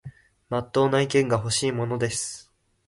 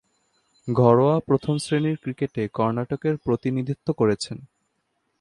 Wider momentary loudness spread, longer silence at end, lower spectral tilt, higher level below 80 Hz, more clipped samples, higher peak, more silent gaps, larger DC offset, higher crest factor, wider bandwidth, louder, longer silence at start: about the same, 9 LU vs 10 LU; second, 0.45 s vs 0.75 s; second, -4.5 dB/octave vs -7 dB/octave; about the same, -56 dBFS vs -56 dBFS; neither; second, -8 dBFS vs -2 dBFS; neither; neither; about the same, 18 dB vs 20 dB; about the same, 11.5 kHz vs 11.5 kHz; about the same, -24 LUFS vs -23 LUFS; second, 0.05 s vs 0.65 s